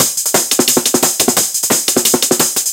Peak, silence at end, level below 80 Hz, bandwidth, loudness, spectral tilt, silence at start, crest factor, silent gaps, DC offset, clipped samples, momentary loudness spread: 0 dBFS; 0 s; -54 dBFS; over 20 kHz; -11 LUFS; -1 dB/octave; 0 s; 14 dB; none; under 0.1%; under 0.1%; 1 LU